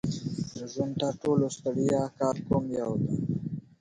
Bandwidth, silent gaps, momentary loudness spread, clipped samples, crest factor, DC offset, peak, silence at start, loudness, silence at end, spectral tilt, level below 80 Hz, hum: 11 kHz; none; 8 LU; under 0.1%; 16 dB; under 0.1%; -12 dBFS; 0.05 s; -30 LUFS; 0.2 s; -7 dB/octave; -56 dBFS; none